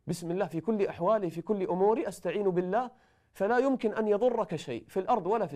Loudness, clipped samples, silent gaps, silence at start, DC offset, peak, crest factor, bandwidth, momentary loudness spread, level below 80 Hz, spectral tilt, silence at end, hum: -30 LUFS; under 0.1%; none; 0.05 s; under 0.1%; -14 dBFS; 14 dB; 14.5 kHz; 7 LU; -66 dBFS; -6.5 dB/octave; 0 s; none